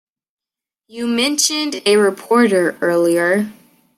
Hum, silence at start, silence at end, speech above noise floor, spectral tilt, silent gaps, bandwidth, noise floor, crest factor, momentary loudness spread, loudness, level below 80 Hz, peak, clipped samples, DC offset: none; 0.95 s; 0.45 s; 73 dB; -3 dB/octave; none; 16 kHz; -88 dBFS; 16 dB; 6 LU; -16 LUFS; -68 dBFS; -2 dBFS; under 0.1%; under 0.1%